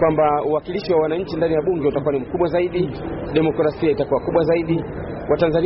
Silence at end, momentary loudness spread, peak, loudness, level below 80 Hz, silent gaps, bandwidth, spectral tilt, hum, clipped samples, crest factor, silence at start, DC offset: 0 s; 5 LU; -6 dBFS; -20 LUFS; -42 dBFS; none; 5.8 kHz; -6.5 dB/octave; none; under 0.1%; 12 dB; 0 s; under 0.1%